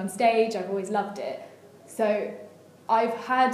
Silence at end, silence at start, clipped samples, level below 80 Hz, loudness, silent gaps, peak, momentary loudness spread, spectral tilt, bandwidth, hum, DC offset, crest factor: 0 s; 0 s; under 0.1%; -86 dBFS; -26 LUFS; none; -10 dBFS; 18 LU; -4.5 dB/octave; 15 kHz; none; under 0.1%; 18 dB